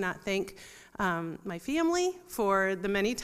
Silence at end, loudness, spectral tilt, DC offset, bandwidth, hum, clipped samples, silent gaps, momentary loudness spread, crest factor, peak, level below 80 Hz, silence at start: 0 s; -30 LUFS; -4.5 dB/octave; under 0.1%; 15.5 kHz; none; under 0.1%; none; 12 LU; 18 dB; -14 dBFS; -58 dBFS; 0 s